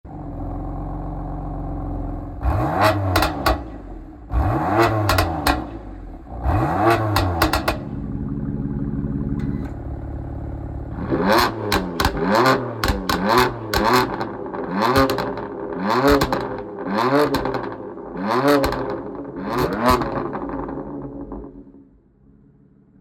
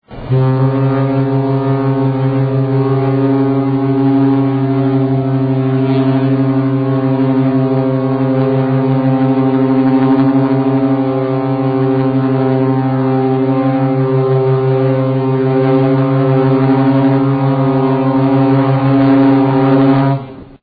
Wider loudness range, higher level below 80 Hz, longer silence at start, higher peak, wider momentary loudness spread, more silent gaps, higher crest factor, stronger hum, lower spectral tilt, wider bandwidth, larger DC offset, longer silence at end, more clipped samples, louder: first, 6 LU vs 2 LU; first, -32 dBFS vs -46 dBFS; about the same, 0.05 s vs 0.1 s; about the same, -2 dBFS vs 0 dBFS; first, 14 LU vs 3 LU; neither; first, 20 dB vs 10 dB; neither; second, -5.5 dB/octave vs -12 dB/octave; first, 19 kHz vs 4.9 kHz; neither; first, 1.2 s vs 0.05 s; neither; second, -21 LUFS vs -13 LUFS